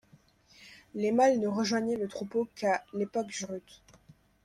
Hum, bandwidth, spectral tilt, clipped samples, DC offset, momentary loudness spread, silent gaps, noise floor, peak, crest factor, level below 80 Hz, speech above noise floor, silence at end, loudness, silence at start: none; 13 kHz; -4.5 dB/octave; under 0.1%; under 0.1%; 13 LU; none; -62 dBFS; -12 dBFS; 18 dB; -70 dBFS; 32 dB; 0.85 s; -30 LUFS; 0.6 s